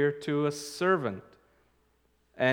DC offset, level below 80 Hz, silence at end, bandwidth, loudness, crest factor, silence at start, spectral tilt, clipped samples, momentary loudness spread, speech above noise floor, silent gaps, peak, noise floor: under 0.1%; -72 dBFS; 0 s; 18.5 kHz; -30 LUFS; 20 dB; 0 s; -5.5 dB/octave; under 0.1%; 8 LU; 40 dB; none; -10 dBFS; -70 dBFS